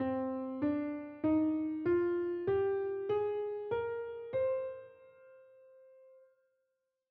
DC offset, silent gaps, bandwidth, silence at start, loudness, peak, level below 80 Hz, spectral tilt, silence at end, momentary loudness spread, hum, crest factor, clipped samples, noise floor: under 0.1%; none; 4.6 kHz; 0 s; -35 LUFS; -22 dBFS; -72 dBFS; -7 dB/octave; 1.05 s; 7 LU; none; 14 dB; under 0.1%; -84 dBFS